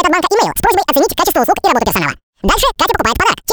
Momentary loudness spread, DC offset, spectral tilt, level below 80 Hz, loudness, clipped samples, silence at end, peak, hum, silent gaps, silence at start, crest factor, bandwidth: 4 LU; under 0.1%; -3 dB/octave; -30 dBFS; -13 LUFS; under 0.1%; 0 s; 0 dBFS; none; 2.23-2.33 s; 0 s; 12 dB; over 20 kHz